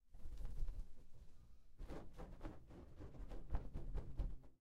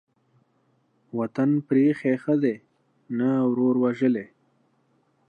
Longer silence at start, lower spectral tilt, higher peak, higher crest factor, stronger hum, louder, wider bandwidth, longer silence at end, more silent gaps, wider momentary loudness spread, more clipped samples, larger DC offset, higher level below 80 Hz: second, 0.05 s vs 1.15 s; second, -7.5 dB/octave vs -9.5 dB/octave; second, -30 dBFS vs -10 dBFS; about the same, 18 dB vs 16 dB; neither; second, -55 LUFS vs -24 LUFS; first, 6.8 kHz vs 4.9 kHz; second, 0.05 s vs 1.05 s; neither; first, 14 LU vs 11 LU; neither; neither; first, -50 dBFS vs -78 dBFS